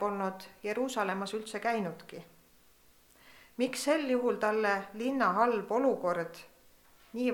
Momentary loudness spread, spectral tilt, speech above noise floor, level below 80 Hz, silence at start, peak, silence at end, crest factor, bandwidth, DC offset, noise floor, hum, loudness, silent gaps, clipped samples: 15 LU; -4.5 dB/octave; 31 dB; -72 dBFS; 0 s; -14 dBFS; 0 s; 20 dB; 19 kHz; under 0.1%; -63 dBFS; none; -32 LUFS; none; under 0.1%